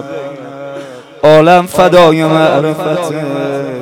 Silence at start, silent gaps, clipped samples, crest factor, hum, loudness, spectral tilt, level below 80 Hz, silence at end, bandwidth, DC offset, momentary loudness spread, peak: 0 s; none; 2%; 10 dB; none; -9 LUFS; -6 dB/octave; -46 dBFS; 0 s; 17.5 kHz; under 0.1%; 19 LU; 0 dBFS